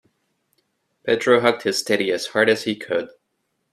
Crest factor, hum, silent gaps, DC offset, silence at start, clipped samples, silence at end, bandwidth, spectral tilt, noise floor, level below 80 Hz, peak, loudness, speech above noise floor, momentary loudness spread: 20 dB; none; none; under 0.1%; 1.05 s; under 0.1%; 0.65 s; 14.5 kHz; -3.5 dB/octave; -73 dBFS; -66 dBFS; -2 dBFS; -20 LUFS; 54 dB; 9 LU